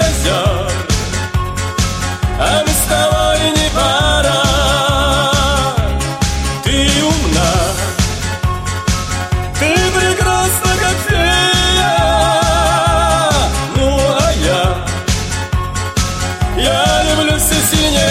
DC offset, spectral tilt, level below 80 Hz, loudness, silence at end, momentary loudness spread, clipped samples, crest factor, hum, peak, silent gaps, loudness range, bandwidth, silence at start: under 0.1%; -3.5 dB/octave; -20 dBFS; -13 LUFS; 0 s; 7 LU; under 0.1%; 12 dB; none; 0 dBFS; none; 3 LU; 16.5 kHz; 0 s